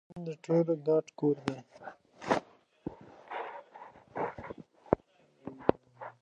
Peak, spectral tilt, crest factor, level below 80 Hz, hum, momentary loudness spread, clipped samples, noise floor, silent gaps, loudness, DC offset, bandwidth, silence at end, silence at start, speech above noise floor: -6 dBFS; -7.5 dB/octave; 28 dB; -62 dBFS; none; 21 LU; under 0.1%; -64 dBFS; none; -33 LUFS; under 0.1%; 9.4 kHz; 0.1 s; 0.1 s; 33 dB